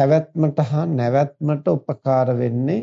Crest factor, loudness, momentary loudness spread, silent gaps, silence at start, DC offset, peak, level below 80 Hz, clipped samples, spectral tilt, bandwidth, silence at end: 14 dB; -20 LUFS; 4 LU; none; 0 s; under 0.1%; -4 dBFS; -66 dBFS; under 0.1%; -9.5 dB/octave; 7 kHz; 0 s